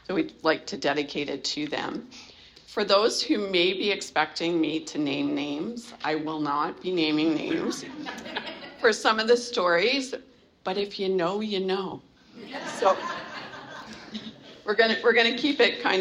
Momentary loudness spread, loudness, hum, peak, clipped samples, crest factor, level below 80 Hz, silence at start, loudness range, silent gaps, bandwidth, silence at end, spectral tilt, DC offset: 17 LU; -26 LUFS; none; -6 dBFS; under 0.1%; 20 dB; -66 dBFS; 0.1 s; 4 LU; none; 12 kHz; 0 s; -3.5 dB/octave; under 0.1%